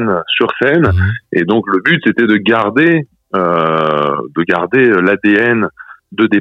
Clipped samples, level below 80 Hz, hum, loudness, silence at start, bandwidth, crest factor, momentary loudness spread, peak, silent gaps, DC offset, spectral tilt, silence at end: under 0.1%; -40 dBFS; none; -12 LUFS; 0 s; 5.8 kHz; 12 dB; 6 LU; 0 dBFS; none; under 0.1%; -8 dB/octave; 0 s